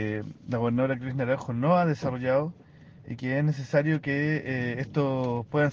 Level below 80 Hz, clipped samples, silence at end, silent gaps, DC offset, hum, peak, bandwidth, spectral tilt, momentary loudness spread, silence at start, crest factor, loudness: -60 dBFS; under 0.1%; 0 s; none; under 0.1%; none; -12 dBFS; 7.2 kHz; -8.5 dB/octave; 8 LU; 0 s; 16 dB; -27 LUFS